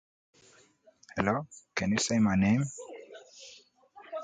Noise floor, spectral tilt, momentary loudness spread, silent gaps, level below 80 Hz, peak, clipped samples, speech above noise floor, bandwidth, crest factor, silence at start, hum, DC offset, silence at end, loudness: -62 dBFS; -5 dB/octave; 23 LU; none; -58 dBFS; -12 dBFS; under 0.1%; 34 dB; 9.4 kHz; 20 dB; 1.15 s; none; under 0.1%; 0 s; -29 LUFS